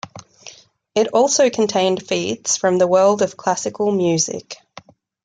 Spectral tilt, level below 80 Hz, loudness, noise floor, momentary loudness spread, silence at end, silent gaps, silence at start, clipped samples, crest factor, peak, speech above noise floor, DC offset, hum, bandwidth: -3.5 dB/octave; -64 dBFS; -18 LUFS; -45 dBFS; 16 LU; 0.7 s; none; 0.05 s; under 0.1%; 16 dB; -4 dBFS; 27 dB; under 0.1%; none; 9.6 kHz